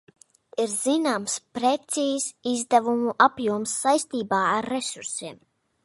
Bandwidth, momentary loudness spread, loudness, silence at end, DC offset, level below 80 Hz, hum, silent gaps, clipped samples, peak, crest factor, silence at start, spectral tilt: 11.5 kHz; 9 LU; -24 LUFS; 0.5 s; under 0.1%; -70 dBFS; none; none; under 0.1%; -4 dBFS; 22 dB; 0.55 s; -3 dB/octave